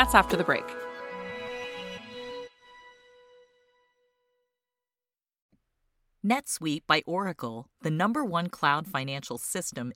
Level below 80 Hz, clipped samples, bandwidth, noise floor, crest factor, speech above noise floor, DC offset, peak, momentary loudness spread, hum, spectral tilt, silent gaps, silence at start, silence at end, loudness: -52 dBFS; under 0.1%; 16.5 kHz; under -90 dBFS; 28 dB; over 62 dB; under 0.1%; -2 dBFS; 14 LU; none; -4 dB/octave; 5.42-5.49 s; 0 s; 0 s; -29 LUFS